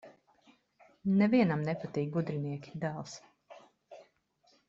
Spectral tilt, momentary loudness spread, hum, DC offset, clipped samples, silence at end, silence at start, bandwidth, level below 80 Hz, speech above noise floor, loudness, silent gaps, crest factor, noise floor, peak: -7.5 dB/octave; 15 LU; none; under 0.1%; under 0.1%; 0.65 s; 0.05 s; 7.6 kHz; -72 dBFS; 39 dB; -32 LUFS; none; 20 dB; -70 dBFS; -14 dBFS